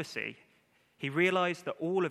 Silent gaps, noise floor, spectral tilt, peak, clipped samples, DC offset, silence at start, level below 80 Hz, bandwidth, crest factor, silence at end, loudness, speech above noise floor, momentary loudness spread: none; -69 dBFS; -5.5 dB/octave; -14 dBFS; under 0.1%; under 0.1%; 0 s; -84 dBFS; 13 kHz; 18 dB; 0 s; -32 LUFS; 37 dB; 12 LU